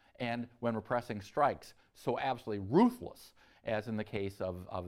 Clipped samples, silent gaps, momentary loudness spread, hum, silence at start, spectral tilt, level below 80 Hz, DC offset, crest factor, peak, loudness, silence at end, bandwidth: under 0.1%; none; 13 LU; none; 0.2 s; -7 dB/octave; -66 dBFS; under 0.1%; 18 dB; -16 dBFS; -35 LUFS; 0 s; 15 kHz